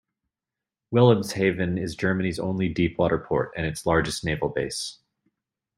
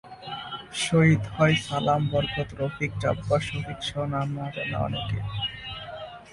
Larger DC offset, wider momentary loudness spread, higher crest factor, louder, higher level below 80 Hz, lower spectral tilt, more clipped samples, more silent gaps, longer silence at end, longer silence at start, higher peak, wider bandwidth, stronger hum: neither; second, 9 LU vs 14 LU; about the same, 22 dB vs 18 dB; about the same, -24 LUFS vs -26 LUFS; about the same, -50 dBFS vs -48 dBFS; about the same, -6 dB/octave vs -5.5 dB/octave; neither; neither; first, 0.85 s vs 0 s; first, 0.9 s vs 0.05 s; first, -4 dBFS vs -8 dBFS; first, 16 kHz vs 11.5 kHz; neither